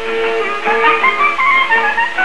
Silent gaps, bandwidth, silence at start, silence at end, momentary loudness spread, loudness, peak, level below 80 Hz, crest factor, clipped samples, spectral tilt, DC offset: none; 11.5 kHz; 0 s; 0 s; 6 LU; -12 LUFS; 0 dBFS; -48 dBFS; 12 dB; under 0.1%; -2.5 dB/octave; 4%